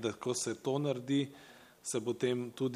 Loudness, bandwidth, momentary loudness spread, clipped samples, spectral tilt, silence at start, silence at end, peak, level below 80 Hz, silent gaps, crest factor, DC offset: -36 LUFS; 15.5 kHz; 8 LU; under 0.1%; -5 dB/octave; 0 s; 0 s; -20 dBFS; -78 dBFS; none; 16 dB; under 0.1%